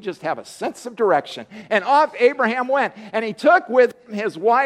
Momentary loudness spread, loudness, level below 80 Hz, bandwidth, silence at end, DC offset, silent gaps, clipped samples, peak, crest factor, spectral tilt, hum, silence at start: 13 LU; -19 LUFS; -72 dBFS; 12 kHz; 0 s; under 0.1%; none; under 0.1%; -2 dBFS; 16 dB; -4.5 dB/octave; none; 0.05 s